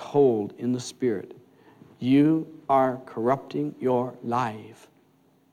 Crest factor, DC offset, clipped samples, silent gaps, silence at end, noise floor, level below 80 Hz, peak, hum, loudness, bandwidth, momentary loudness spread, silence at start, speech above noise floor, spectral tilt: 16 dB; under 0.1%; under 0.1%; none; 0.8 s; -62 dBFS; -72 dBFS; -10 dBFS; none; -25 LUFS; 12 kHz; 11 LU; 0 s; 37 dB; -7 dB/octave